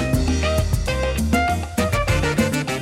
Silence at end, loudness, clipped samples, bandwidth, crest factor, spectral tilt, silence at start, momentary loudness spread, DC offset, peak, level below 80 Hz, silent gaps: 0 s; -21 LUFS; under 0.1%; 17 kHz; 12 dB; -5.5 dB/octave; 0 s; 3 LU; under 0.1%; -8 dBFS; -26 dBFS; none